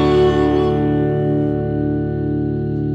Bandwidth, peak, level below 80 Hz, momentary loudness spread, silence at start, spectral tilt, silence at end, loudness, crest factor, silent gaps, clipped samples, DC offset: 7.8 kHz; -4 dBFS; -32 dBFS; 6 LU; 0 s; -9 dB/octave; 0 s; -18 LUFS; 12 dB; none; under 0.1%; under 0.1%